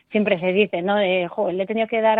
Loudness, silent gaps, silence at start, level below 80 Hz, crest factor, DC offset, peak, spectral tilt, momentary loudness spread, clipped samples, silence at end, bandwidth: -21 LUFS; none; 0.1 s; -64 dBFS; 16 dB; under 0.1%; -4 dBFS; -9 dB/octave; 4 LU; under 0.1%; 0 s; 4.3 kHz